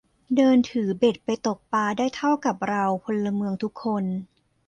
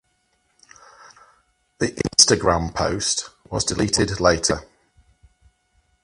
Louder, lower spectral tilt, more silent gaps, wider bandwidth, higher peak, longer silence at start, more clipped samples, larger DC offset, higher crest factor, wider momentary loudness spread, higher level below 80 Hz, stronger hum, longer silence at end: second, -24 LUFS vs -20 LUFS; first, -6 dB/octave vs -3 dB/octave; neither; second, 9 kHz vs 16 kHz; second, -8 dBFS vs 0 dBFS; second, 0.3 s vs 1.8 s; neither; neither; second, 16 dB vs 24 dB; second, 8 LU vs 12 LU; second, -64 dBFS vs -42 dBFS; neither; second, 0.45 s vs 1.4 s